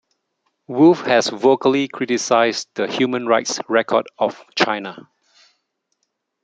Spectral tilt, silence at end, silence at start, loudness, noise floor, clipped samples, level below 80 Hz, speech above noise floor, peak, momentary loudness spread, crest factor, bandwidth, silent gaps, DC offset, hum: -4 dB/octave; 1.45 s; 0.7 s; -18 LUFS; -74 dBFS; under 0.1%; -64 dBFS; 56 dB; 0 dBFS; 9 LU; 18 dB; 9.2 kHz; none; under 0.1%; none